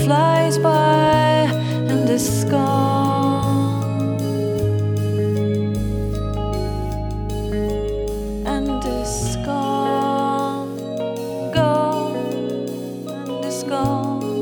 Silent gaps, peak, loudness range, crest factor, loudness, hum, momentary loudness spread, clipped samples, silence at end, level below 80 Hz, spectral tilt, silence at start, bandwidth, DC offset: none; -4 dBFS; 6 LU; 16 dB; -20 LUFS; none; 10 LU; under 0.1%; 0 s; -34 dBFS; -6 dB/octave; 0 s; 19 kHz; under 0.1%